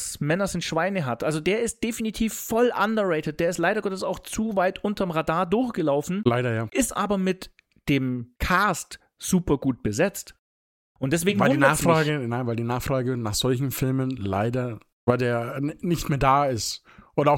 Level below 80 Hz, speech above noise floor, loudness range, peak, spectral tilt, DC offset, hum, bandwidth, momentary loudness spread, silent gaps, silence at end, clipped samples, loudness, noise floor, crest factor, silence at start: -46 dBFS; over 66 dB; 2 LU; -4 dBFS; -5 dB/octave; under 0.1%; none; 17 kHz; 9 LU; 10.39-10.95 s, 14.92-15.07 s; 0 s; under 0.1%; -25 LUFS; under -90 dBFS; 20 dB; 0 s